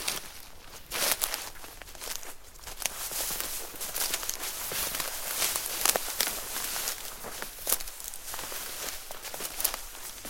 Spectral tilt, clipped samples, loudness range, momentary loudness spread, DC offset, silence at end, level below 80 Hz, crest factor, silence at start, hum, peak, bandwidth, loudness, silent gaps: 0.5 dB/octave; under 0.1%; 4 LU; 14 LU; under 0.1%; 0 s; -52 dBFS; 34 dB; 0 s; none; 0 dBFS; 17 kHz; -31 LUFS; none